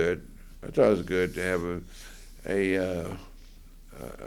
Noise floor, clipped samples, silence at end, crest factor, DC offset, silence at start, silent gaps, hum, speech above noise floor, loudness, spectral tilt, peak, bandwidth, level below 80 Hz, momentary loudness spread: -48 dBFS; under 0.1%; 0 s; 20 dB; under 0.1%; 0 s; none; none; 20 dB; -28 LUFS; -6 dB/octave; -10 dBFS; 18.5 kHz; -46 dBFS; 21 LU